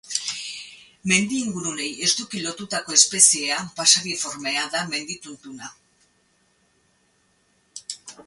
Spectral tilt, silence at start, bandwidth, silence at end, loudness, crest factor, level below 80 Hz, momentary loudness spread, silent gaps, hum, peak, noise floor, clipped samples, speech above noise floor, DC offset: -1 dB/octave; 0.05 s; 12 kHz; 0.05 s; -20 LUFS; 26 dB; -66 dBFS; 23 LU; none; none; 0 dBFS; -65 dBFS; under 0.1%; 42 dB; under 0.1%